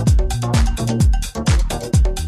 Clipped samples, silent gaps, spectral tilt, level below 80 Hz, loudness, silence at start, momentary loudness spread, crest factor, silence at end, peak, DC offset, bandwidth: under 0.1%; none; -5.5 dB/octave; -18 dBFS; -18 LUFS; 0 s; 2 LU; 12 dB; 0 s; -4 dBFS; under 0.1%; 14 kHz